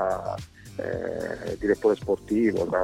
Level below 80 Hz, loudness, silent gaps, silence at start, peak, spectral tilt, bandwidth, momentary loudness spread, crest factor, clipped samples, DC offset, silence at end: -50 dBFS; -27 LUFS; none; 0 s; -8 dBFS; -7 dB/octave; 15 kHz; 11 LU; 18 dB; under 0.1%; under 0.1%; 0 s